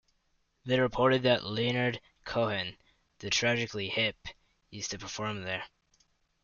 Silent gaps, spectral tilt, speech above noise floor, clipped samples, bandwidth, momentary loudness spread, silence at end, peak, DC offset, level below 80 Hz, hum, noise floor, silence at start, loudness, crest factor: none; -4 dB/octave; 43 dB; under 0.1%; 7.4 kHz; 18 LU; 0.75 s; -12 dBFS; under 0.1%; -60 dBFS; none; -74 dBFS; 0.65 s; -30 LUFS; 22 dB